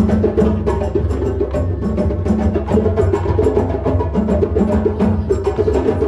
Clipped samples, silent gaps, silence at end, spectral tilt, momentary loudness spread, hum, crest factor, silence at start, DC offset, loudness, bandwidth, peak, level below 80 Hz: under 0.1%; none; 0 s; -9.5 dB/octave; 4 LU; none; 12 dB; 0 s; under 0.1%; -17 LUFS; 10.5 kHz; -4 dBFS; -24 dBFS